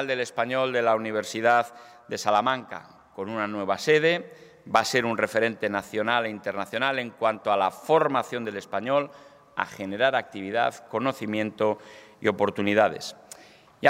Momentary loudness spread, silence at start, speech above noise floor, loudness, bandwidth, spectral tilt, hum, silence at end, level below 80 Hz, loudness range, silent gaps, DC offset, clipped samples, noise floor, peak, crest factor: 13 LU; 0 s; 26 dB; -26 LUFS; 16 kHz; -4.5 dB/octave; none; 0 s; -72 dBFS; 3 LU; none; under 0.1%; under 0.1%; -52 dBFS; -4 dBFS; 22 dB